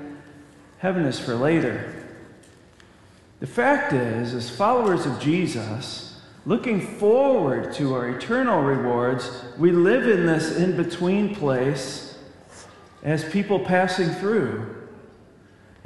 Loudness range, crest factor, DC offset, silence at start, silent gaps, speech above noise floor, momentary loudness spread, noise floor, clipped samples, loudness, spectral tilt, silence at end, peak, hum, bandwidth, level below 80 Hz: 4 LU; 18 dB; under 0.1%; 0 s; none; 30 dB; 15 LU; -51 dBFS; under 0.1%; -23 LUFS; -6.5 dB/octave; 0.8 s; -6 dBFS; none; 12 kHz; -60 dBFS